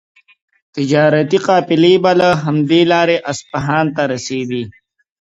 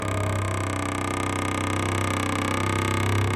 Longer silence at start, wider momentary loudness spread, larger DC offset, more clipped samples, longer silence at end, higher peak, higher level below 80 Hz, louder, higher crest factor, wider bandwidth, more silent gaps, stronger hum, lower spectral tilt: first, 0.75 s vs 0 s; first, 11 LU vs 3 LU; neither; neither; first, 0.5 s vs 0 s; first, 0 dBFS vs -10 dBFS; second, -52 dBFS vs -46 dBFS; first, -14 LUFS vs -25 LUFS; about the same, 14 dB vs 14 dB; second, 8 kHz vs 14 kHz; neither; neither; about the same, -5.5 dB/octave vs -5 dB/octave